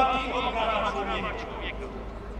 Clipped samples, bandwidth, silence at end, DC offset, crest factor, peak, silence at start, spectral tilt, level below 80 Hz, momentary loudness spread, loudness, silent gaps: under 0.1%; 10 kHz; 0 s; under 0.1%; 20 dB; -10 dBFS; 0 s; -5 dB/octave; -40 dBFS; 11 LU; -29 LUFS; none